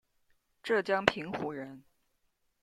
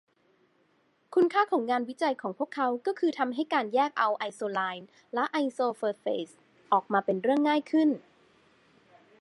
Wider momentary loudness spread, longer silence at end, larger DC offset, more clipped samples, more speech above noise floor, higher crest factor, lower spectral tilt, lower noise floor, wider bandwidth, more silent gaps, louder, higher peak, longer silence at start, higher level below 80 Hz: first, 16 LU vs 8 LU; second, 0.8 s vs 1.2 s; neither; neither; about the same, 44 dB vs 41 dB; first, 30 dB vs 18 dB; about the same, -5 dB/octave vs -5.5 dB/octave; first, -76 dBFS vs -69 dBFS; first, 13.5 kHz vs 11.5 kHz; neither; second, -32 LUFS vs -29 LUFS; first, -6 dBFS vs -10 dBFS; second, 0.65 s vs 1.1 s; first, -66 dBFS vs -86 dBFS